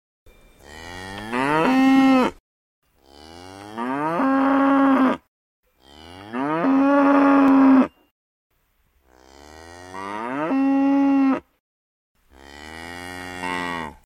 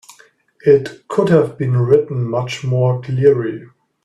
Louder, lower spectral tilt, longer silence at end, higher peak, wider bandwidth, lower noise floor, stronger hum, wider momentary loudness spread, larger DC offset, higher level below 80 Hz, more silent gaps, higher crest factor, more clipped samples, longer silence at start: second, -19 LUFS vs -16 LUFS; second, -6 dB/octave vs -8 dB/octave; second, 0.15 s vs 0.4 s; second, -4 dBFS vs 0 dBFS; about the same, 11 kHz vs 11 kHz; first, -65 dBFS vs -50 dBFS; neither; first, 22 LU vs 7 LU; neither; about the same, -56 dBFS vs -54 dBFS; first, 2.40-2.82 s, 5.28-5.63 s, 8.11-8.50 s, 11.60-12.15 s vs none; about the same, 16 dB vs 16 dB; neither; about the same, 0.7 s vs 0.65 s